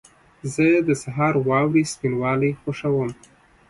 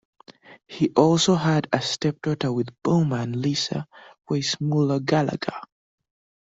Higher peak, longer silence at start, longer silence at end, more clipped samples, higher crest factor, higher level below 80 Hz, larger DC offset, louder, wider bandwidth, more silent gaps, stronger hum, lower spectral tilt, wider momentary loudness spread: second, -6 dBFS vs -2 dBFS; first, 0.45 s vs 0.3 s; second, 0.55 s vs 0.8 s; neither; second, 16 dB vs 22 dB; about the same, -56 dBFS vs -60 dBFS; neither; about the same, -21 LUFS vs -23 LUFS; first, 11.5 kHz vs 8 kHz; neither; neither; about the same, -6.5 dB/octave vs -5.5 dB/octave; second, 9 LU vs 12 LU